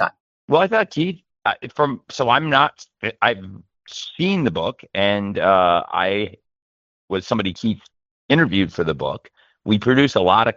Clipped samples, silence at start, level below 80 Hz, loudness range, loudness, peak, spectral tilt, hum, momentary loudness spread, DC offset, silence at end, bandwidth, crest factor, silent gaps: under 0.1%; 0 s; -56 dBFS; 3 LU; -19 LUFS; -2 dBFS; -6 dB/octave; none; 13 LU; under 0.1%; 0.05 s; 7.6 kHz; 18 dB; 0.20-0.48 s, 6.62-7.08 s, 8.11-8.29 s